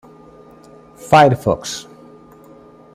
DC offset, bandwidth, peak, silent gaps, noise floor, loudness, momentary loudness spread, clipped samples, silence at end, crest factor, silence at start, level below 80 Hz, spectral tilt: under 0.1%; 15.5 kHz; 0 dBFS; none; -43 dBFS; -14 LUFS; 19 LU; under 0.1%; 1.15 s; 18 dB; 1.05 s; -50 dBFS; -5.5 dB/octave